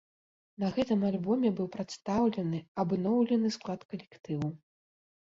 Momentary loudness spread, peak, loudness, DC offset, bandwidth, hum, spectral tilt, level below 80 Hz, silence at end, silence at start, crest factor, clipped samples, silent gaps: 10 LU; -16 dBFS; -31 LUFS; under 0.1%; 7.8 kHz; none; -7.5 dB/octave; -66 dBFS; 0.65 s; 0.6 s; 16 dB; under 0.1%; 2.68-2.75 s, 3.85-3.89 s